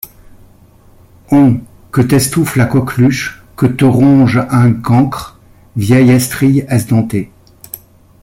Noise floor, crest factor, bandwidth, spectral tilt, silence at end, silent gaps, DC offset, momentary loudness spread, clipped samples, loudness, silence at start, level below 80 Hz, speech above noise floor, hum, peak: -43 dBFS; 10 dB; 16.5 kHz; -6.5 dB/octave; 0.45 s; none; under 0.1%; 19 LU; under 0.1%; -11 LUFS; 0.05 s; -42 dBFS; 33 dB; none; -2 dBFS